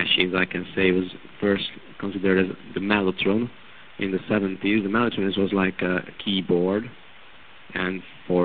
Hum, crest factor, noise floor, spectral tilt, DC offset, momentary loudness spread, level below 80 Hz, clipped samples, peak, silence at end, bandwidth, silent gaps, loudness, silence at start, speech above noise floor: none; 22 dB; -49 dBFS; -3.5 dB/octave; 0.4%; 10 LU; -54 dBFS; under 0.1%; -4 dBFS; 0 s; 4.7 kHz; none; -24 LUFS; 0 s; 25 dB